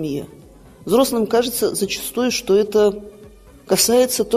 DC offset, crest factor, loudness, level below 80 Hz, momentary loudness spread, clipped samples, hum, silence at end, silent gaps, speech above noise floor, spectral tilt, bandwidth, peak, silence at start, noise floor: under 0.1%; 16 dB; -18 LUFS; -48 dBFS; 14 LU; under 0.1%; none; 0 s; none; 26 dB; -3.5 dB/octave; 15.5 kHz; -2 dBFS; 0 s; -44 dBFS